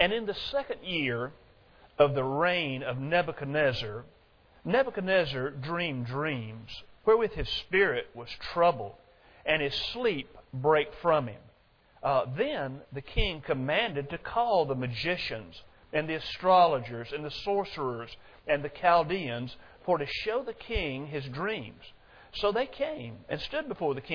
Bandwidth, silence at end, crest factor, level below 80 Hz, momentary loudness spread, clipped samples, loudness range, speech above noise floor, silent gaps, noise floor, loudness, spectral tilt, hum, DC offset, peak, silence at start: 5.4 kHz; 0 s; 22 dB; -48 dBFS; 14 LU; under 0.1%; 4 LU; 33 dB; none; -62 dBFS; -30 LUFS; -6.5 dB/octave; none; under 0.1%; -8 dBFS; 0 s